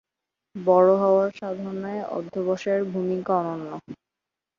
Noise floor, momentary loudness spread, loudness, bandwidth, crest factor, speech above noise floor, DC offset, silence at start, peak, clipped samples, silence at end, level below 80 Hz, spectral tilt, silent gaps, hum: -87 dBFS; 15 LU; -24 LUFS; 7.2 kHz; 20 dB; 64 dB; under 0.1%; 0.55 s; -6 dBFS; under 0.1%; 0.65 s; -70 dBFS; -8 dB/octave; none; none